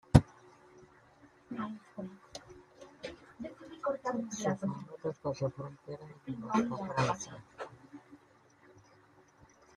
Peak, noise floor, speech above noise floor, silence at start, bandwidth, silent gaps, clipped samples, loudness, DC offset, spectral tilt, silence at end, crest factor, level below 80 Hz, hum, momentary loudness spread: -4 dBFS; -64 dBFS; 27 dB; 0.15 s; 11.5 kHz; none; under 0.1%; -37 LUFS; under 0.1%; -6.5 dB/octave; 1.6 s; 32 dB; -54 dBFS; none; 17 LU